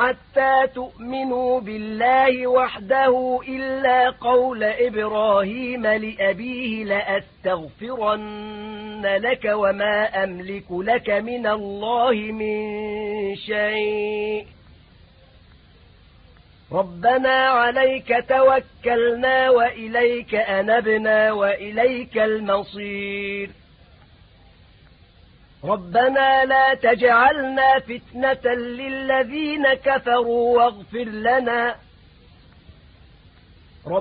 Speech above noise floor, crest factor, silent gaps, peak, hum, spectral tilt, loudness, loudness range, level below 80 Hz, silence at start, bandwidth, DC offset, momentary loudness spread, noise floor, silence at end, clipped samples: 31 dB; 18 dB; none; -4 dBFS; none; -9 dB/octave; -20 LUFS; 9 LU; -52 dBFS; 0 s; 4.9 kHz; under 0.1%; 11 LU; -51 dBFS; 0 s; under 0.1%